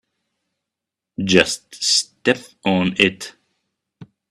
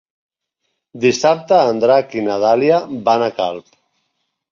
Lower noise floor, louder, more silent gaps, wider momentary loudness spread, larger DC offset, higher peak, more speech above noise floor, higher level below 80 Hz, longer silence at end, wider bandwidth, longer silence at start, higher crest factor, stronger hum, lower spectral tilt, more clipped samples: first, -85 dBFS vs -73 dBFS; second, -18 LUFS vs -15 LUFS; neither; first, 16 LU vs 8 LU; neither; about the same, 0 dBFS vs -2 dBFS; first, 66 dB vs 58 dB; about the same, -56 dBFS vs -60 dBFS; second, 0.25 s vs 0.9 s; first, 13 kHz vs 7.6 kHz; first, 1.2 s vs 0.95 s; first, 22 dB vs 16 dB; neither; second, -3 dB/octave vs -5 dB/octave; neither